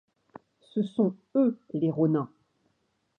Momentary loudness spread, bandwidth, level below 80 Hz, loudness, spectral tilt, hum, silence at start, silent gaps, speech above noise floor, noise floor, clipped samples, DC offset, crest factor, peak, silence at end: 7 LU; 4.2 kHz; -78 dBFS; -28 LUFS; -10.5 dB/octave; none; 0.75 s; none; 48 dB; -75 dBFS; under 0.1%; under 0.1%; 18 dB; -12 dBFS; 0.95 s